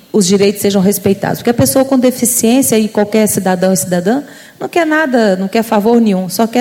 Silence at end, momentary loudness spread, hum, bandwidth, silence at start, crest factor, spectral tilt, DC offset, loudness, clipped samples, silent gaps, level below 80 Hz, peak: 0 s; 5 LU; none; 17 kHz; 0.15 s; 12 dB; -4.5 dB/octave; under 0.1%; -12 LUFS; under 0.1%; none; -50 dBFS; 0 dBFS